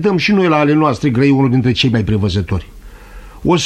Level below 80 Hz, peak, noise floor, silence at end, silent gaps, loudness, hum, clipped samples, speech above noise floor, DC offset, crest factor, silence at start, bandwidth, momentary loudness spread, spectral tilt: -36 dBFS; -2 dBFS; -34 dBFS; 0 s; none; -14 LUFS; none; under 0.1%; 21 dB; under 0.1%; 12 dB; 0 s; 11.5 kHz; 8 LU; -6.5 dB/octave